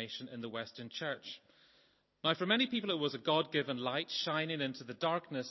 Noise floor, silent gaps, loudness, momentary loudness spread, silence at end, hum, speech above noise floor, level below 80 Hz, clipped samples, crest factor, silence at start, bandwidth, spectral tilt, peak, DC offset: -71 dBFS; none; -36 LUFS; 12 LU; 0 s; none; 35 dB; -84 dBFS; under 0.1%; 20 dB; 0 s; 6.2 kHz; -5 dB/octave; -16 dBFS; under 0.1%